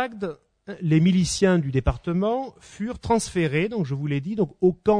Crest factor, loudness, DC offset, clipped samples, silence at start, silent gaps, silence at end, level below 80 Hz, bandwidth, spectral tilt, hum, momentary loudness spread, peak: 16 dB; -24 LUFS; under 0.1%; under 0.1%; 0 s; none; 0 s; -40 dBFS; 10 kHz; -6 dB/octave; none; 13 LU; -6 dBFS